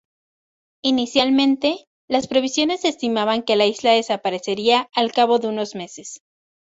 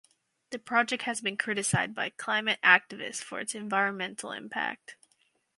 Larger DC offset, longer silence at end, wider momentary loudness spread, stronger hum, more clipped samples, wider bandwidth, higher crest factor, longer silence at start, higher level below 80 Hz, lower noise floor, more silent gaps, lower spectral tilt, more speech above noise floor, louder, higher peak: neither; about the same, 0.6 s vs 0.65 s; second, 11 LU vs 15 LU; neither; neither; second, 8 kHz vs 11.5 kHz; second, 20 dB vs 26 dB; first, 0.85 s vs 0.5 s; first, -62 dBFS vs -72 dBFS; first, under -90 dBFS vs -71 dBFS; first, 1.87-2.08 s vs none; about the same, -3.5 dB/octave vs -2.5 dB/octave; first, over 71 dB vs 42 dB; first, -19 LUFS vs -28 LUFS; about the same, -2 dBFS vs -4 dBFS